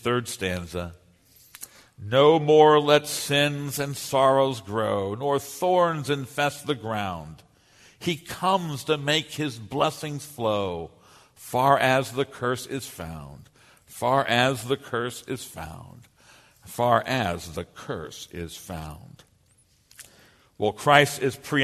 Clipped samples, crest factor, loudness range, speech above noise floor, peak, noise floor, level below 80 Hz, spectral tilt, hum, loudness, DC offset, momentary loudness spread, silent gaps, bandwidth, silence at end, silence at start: under 0.1%; 24 dB; 8 LU; 38 dB; 0 dBFS; -62 dBFS; -56 dBFS; -4.5 dB/octave; none; -24 LUFS; under 0.1%; 19 LU; none; 13.5 kHz; 0 s; 0.05 s